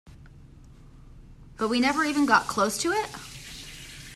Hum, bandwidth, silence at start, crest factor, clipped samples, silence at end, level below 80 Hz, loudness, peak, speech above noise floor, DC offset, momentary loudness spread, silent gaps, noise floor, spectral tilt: none; 14.5 kHz; 0.05 s; 22 dB; under 0.1%; 0 s; -52 dBFS; -24 LUFS; -6 dBFS; 25 dB; under 0.1%; 18 LU; none; -49 dBFS; -3 dB/octave